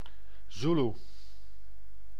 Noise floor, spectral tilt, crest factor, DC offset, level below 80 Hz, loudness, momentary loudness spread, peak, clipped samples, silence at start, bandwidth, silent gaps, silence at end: -55 dBFS; -7 dB/octave; 18 dB; 3%; -54 dBFS; -31 LUFS; 25 LU; -18 dBFS; under 0.1%; 0.05 s; 10 kHz; none; 1.2 s